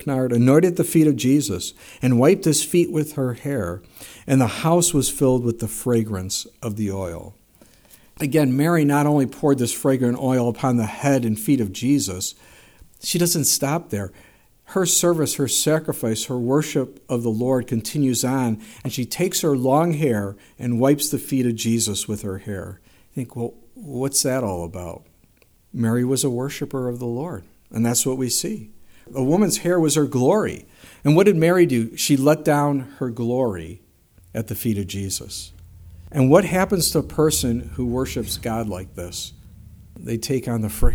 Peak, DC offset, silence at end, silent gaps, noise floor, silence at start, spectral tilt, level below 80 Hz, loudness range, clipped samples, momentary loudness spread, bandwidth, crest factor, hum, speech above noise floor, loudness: -2 dBFS; under 0.1%; 0 s; none; -56 dBFS; 0 s; -5 dB/octave; -38 dBFS; 6 LU; under 0.1%; 14 LU; over 20 kHz; 20 dB; none; 36 dB; -21 LUFS